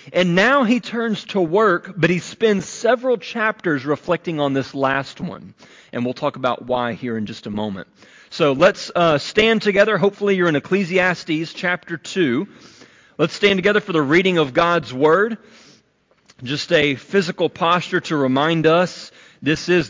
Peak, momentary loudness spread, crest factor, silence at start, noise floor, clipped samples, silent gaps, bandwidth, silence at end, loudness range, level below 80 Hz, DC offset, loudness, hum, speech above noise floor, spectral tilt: -4 dBFS; 11 LU; 16 dB; 0.05 s; -60 dBFS; under 0.1%; none; 7.6 kHz; 0 s; 5 LU; -56 dBFS; under 0.1%; -18 LUFS; none; 41 dB; -5.5 dB/octave